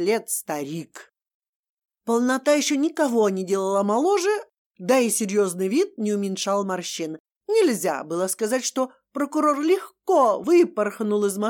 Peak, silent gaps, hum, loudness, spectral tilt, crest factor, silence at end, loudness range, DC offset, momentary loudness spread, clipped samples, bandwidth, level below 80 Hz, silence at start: -8 dBFS; 1.34-1.42 s, 1.48-1.64 s, 1.70-1.82 s, 4.58-4.70 s, 7.20-7.25 s, 7.36-7.41 s; none; -23 LUFS; -4 dB/octave; 16 dB; 0 s; 3 LU; under 0.1%; 10 LU; under 0.1%; 19 kHz; -82 dBFS; 0 s